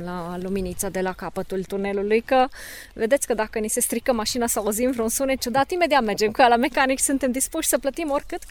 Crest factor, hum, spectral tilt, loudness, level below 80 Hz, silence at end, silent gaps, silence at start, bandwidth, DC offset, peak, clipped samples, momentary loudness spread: 18 dB; none; -3 dB/octave; -22 LUFS; -46 dBFS; 0 s; none; 0 s; 18 kHz; under 0.1%; -4 dBFS; under 0.1%; 9 LU